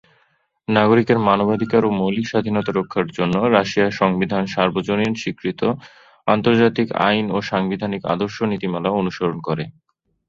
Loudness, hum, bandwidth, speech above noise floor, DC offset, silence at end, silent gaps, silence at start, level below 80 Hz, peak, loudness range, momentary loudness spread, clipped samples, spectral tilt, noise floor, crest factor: -19 LUFS; none; 7.6 kHz; 44 dB; under 0.1%; 0.6 s; none; 0.7 s; -54 dBFS; -2 dBFS; 2 LU; 8 LU; under 0.1%; -6.5 dB/octave; -63 dBFS; 18 dB